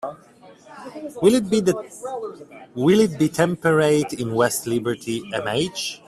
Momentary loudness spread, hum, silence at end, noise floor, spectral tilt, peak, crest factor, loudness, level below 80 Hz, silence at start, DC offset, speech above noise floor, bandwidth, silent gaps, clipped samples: 18 LU; none; 0.1 s; -43 dBFS; -5 dB/octave; -4 dBFS; 18 dB; -21 LUFS; -58 dBFS; 0.05 s; under 0.1%; 22 dB; 15.5 kHz; none; under 0.1%